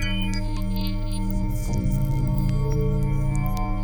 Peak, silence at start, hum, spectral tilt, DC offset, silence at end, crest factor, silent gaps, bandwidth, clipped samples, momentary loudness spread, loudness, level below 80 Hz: -10 dBFS; 0 s; none; -6.5 dB/octave; under 0.1%; 0 s; 12 dB; none; over 20 kHz; under 0.1%; 4 LU; -26 LUFS; -26 dBFS